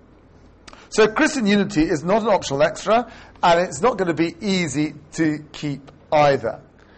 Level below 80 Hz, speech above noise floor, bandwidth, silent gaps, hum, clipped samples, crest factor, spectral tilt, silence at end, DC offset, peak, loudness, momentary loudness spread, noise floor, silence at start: -48 dBFS; 30 dB; 8.8 kHz; none; none; under 0.1%; 14 dB; -5 dB/octave; 0.4 s; under 0.1%; -6 dBFS; -20 LUFS; 12 LU; -49 dBFS; 0.9 s